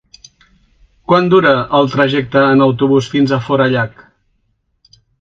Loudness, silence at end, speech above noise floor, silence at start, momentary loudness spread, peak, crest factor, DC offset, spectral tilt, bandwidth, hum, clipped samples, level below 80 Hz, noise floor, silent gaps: -12 LUFS; 1.35 s; 51 dB; 1.1 s; 5 LU; 0 dBFS; 14 dB; under 0.1%; -7 dB/octave; 7.6 kHz; none; under 0.1%; -50 dBFS; -63 dBFS; none